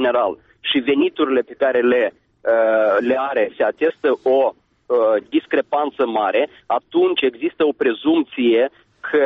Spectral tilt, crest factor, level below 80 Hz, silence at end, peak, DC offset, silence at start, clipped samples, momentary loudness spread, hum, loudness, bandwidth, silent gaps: -1.5 dB/octave; 12 dB; -62 dBFS; 0 s; -6 dBFS; under 0.1%; 0 s; under 0.1%; 5 LU; none; -19 LUFS; 4.8 kHz; none